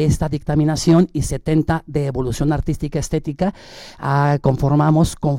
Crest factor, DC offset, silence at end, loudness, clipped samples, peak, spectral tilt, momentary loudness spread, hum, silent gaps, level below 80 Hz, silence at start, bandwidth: 12 dB; under 0.1%; 0 s; -18 LUFS; under 0.1%; -4 dBFS; -7 dB/octave; 8 LU; none; none; -32 dBFS; 0 s; 15.5 kHz